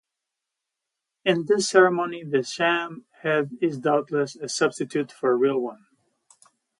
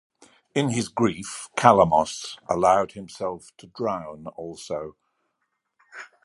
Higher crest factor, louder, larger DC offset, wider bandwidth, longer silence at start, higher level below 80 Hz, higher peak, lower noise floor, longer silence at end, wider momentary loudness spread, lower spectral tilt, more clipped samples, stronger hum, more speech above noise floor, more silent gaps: about the same, 20 dB vs 24 dB; about the same, -23 LUFS vs -23 LUFS; neither; about the same, 11.5 kHz vs 11.5 kHz; first, 1.25 s vs 0.55 s; second, -74 dBFS vs -56 dBFS; about the same, -4 dBFS vs -2 dBFS; first, -85 dBFS vs -77 dBFS; first, 1.05 s vs 0.2 s; second, 9 LU vs 20 LU; about the same, -4.5 dB/octave vs -5 dB/octave; neither; neither; first, 62 dB vs 53 dB; neither